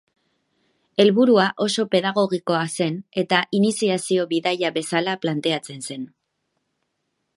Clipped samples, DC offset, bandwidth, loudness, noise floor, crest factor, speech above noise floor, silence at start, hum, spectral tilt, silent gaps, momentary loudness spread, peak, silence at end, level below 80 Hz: under 0.1%; under 0.1%; 11.5 kHz; -21 LUFS; -75 dBFS; 20 dB; 54 dB; 1 s; none; -4.5 dB/octave; none; 11 LU; -2 dBFS; 1.3 s; -72 dBFS